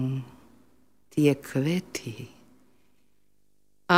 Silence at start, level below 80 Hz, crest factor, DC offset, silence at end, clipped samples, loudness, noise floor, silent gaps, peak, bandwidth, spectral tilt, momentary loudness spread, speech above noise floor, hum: 0 s; -68 dBFS; 26 dB; 0.1%; 0 s; under 0.1%; -28 LUFS; -72 dBFS; none; -4 dBFS; 16 kHz; -6 dB/octave; 22 LU; 46 dB; 50 Hz at -55 dBFS